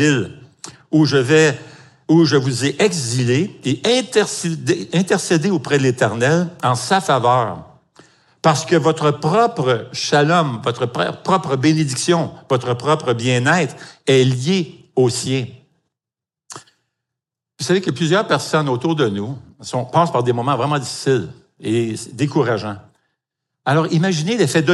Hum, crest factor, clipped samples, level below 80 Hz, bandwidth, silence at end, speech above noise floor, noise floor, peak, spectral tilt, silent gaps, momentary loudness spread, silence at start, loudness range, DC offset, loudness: none; 18 dB; under 0.1%; -64 dBFS; 12 kHz; 0 s; 71 dB; -88 dBFS; 0 dBFS; -5 dB/octave; none; 11 LU; 0 s; 4 LU; under 0.1%; -17 LUFS